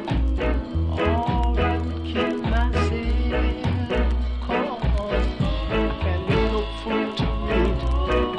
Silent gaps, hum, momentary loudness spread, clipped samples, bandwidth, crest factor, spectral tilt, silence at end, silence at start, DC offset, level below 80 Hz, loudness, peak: none; none; 3 LU; under 0.1%; 8.4 kHz; 14 dB; -7.5 dB/octave; 0 s; 0 s; under 0.1%; -26 dBFS; -24 LUFS; -8 dBFS